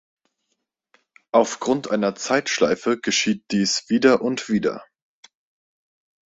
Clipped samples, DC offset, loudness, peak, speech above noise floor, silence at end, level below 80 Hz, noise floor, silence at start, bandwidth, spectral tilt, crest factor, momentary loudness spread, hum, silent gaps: under 0.1%; under 0.1%; -21 LUFS; -2 dBFS; 56 dB; 1.45 s; -62 dBFS; -76 dBFS; 1.35 s; 8 kHz; -3.5 dB/octave; 20 dB; 5 LU; none; none